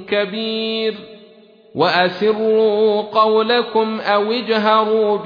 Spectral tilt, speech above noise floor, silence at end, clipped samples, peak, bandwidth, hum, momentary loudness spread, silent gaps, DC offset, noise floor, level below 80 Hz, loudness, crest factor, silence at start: -6.5 dB/octave; 30 dB; 0 s; under 0.1%; 0 dBFS; 5.2 kHz; none; 7 LU; none; under 0.1%; -46 dBFS; -66 dBFS; -16 LUFS; 16 dB; 0 s